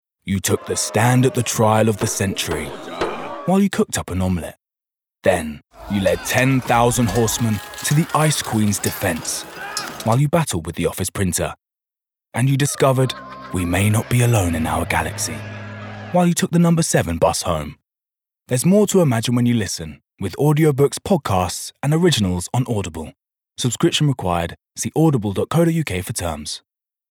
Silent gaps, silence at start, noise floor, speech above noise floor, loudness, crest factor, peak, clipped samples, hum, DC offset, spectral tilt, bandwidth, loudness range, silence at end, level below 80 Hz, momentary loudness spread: none; 0.25 s; -87 dBFS; 69 dB; -19 LUFS; 18 dB; -2 dBFS; under 0.1%; none; under 0.1%; -5 dB/octave; over 20 kHz; 3 LU; 0.55 s; -46 dBFS; 11 LU